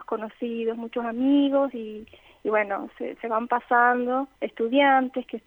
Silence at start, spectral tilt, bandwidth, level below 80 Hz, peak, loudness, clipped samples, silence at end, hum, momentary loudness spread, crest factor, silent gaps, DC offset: 0 s; -6.5 dB/octave; 3.9 kHz; -66 dBFS; -8 dBFS; -24 LUFS; under 0.1%; 0.1 s; none; 14 LU; 18 dB; none; under 0.1%